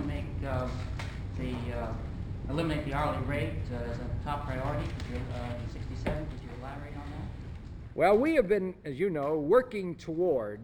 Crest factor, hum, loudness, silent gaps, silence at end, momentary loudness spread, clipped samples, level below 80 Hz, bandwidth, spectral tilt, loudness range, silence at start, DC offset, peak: 20 dB; none; -32 LUFS; none; 0 s; 15 LU; under 0.1%; -42 dBFS; 16 kHz; -7.5 dB/octave; 8 LU; 0 s; under 0.1%; -12 dBFS